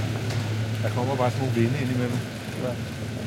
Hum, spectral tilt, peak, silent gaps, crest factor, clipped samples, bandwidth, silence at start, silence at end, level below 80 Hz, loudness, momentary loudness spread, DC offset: none; -6.5 dB/octave; -10 dBFS; none; 16 dB; under 0.1%; 16 kHz; 0 s; 0 s; -52 dBFS; -27 LUFS; 7 LU; under 0.1%